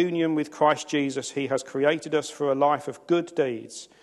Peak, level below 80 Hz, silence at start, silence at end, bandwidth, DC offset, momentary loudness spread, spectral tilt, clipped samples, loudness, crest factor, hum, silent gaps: -6 dBFS; -74 dBFS; 0 s; 0.2 s; 12.5 kHz; under 0.1%; 6 LU; -5 dB/octave; under 0.1%; -25 LUFS; 18 dB; none; none